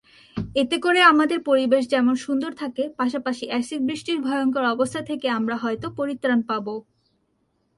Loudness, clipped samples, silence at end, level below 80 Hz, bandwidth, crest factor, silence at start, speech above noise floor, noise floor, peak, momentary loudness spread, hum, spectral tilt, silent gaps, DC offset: -22 LUFS; under 0.1%; 0.95 s; -58 dBFS; 11.5 kHz; 20 dB; 0.35 s; 47 dB; -69 dBFS; -2 dBFS; 11 LU; none; -4.5 dB/octave; none; under 0.1%